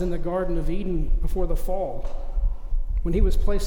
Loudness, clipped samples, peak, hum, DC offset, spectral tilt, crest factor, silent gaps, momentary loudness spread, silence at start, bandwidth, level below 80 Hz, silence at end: -28 LUFS; under 0.1%; -8 dBFS; none; under 0.1%; -7.5 dB/octave; 12 dB; none; 7 LU; 0 s; 10.5 kHz; -22 dBFS; 0 s